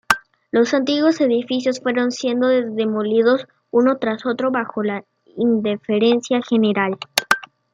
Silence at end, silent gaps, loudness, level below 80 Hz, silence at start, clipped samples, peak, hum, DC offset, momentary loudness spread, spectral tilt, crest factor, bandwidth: 0.3 s; none; -19 LUFS; -66 dBFS; 0.1 s; under 0.1%; 0 dBFS; none; under 0.1%; 5 LU; -4.5 dB/octave; 18 dB; 16 kHz